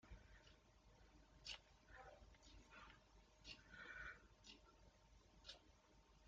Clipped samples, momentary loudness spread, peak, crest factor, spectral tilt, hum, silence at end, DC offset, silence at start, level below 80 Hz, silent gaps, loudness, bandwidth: under 0.1%; 11 LU; -40 dBFS; 24 dB; -1 dB/octave; none; 0 s; under 0.1%; 0 s; -72 dBFS; none; -62 LUFS; 7.4 kHz